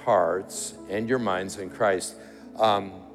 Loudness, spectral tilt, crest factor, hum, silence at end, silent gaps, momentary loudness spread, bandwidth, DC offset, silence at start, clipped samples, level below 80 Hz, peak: -27 LUFS; -4 dB/octave; 18 dB; none; 0 s; none; 12 LU; 15 kHz; under 0.1%; 0 s; under 0.1%; -64 dBFS; -10 dBFS